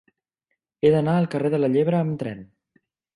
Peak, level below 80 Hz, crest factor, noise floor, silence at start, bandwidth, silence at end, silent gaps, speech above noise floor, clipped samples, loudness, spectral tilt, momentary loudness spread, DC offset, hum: -6 dBFS; -62 dBFS; 18 dB; -79 dBFS; 0.85 s; 10.5 kHz; 0.7 s; none; 58 dB; under 0.1%; -22 LUFS; -9 dB/octave; 12 LU; under 0.1%; none